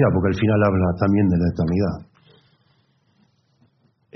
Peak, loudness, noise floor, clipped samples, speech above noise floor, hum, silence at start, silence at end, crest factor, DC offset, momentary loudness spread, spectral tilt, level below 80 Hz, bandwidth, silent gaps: -4 dBFS; -20 LUFS; -62 dBFS; under 0.1%; 44 dB; none; 0 s; 2.15 s; 18 dB; under 0.1%; 5 LU; -8 dB/octave; -48 dBFS; 6.2 kHz; none